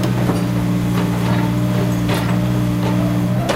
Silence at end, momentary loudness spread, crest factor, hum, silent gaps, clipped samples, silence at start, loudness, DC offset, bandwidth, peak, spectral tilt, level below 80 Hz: 0 s; 1 LU; 12 dB; 60 Hz at -25 dBFS; none; under 0.1%; 0 s; -18 LUFS; under 0.1%; 16 kHz; -4 dBFS; -7 dB/octave; -34 dBFS